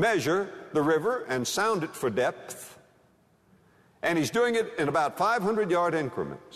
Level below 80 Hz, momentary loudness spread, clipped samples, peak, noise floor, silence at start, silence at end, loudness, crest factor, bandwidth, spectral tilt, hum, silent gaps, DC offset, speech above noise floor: -68 dBFS; 8 LU; under 0.1%; -12 dBFS; -63 dBFS; 0 s; 0 s; -27 LUFS; 16 dB; 13.5 kHz; -4.5 dB/octave; none; none; under 0.1%; 36 dB